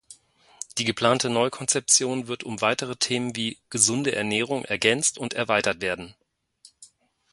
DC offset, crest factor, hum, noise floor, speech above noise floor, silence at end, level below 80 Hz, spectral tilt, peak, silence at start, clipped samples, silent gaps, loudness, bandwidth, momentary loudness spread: under 0.1%; 24 dB; none; -57 dBFS; 33 dB; 0.5 s; -62 dBFS; -2.5 dB/octave; -2 dBFS; 0.1 s; under 0.1%; none; -23 LUFS; 12 kHz; 11 LU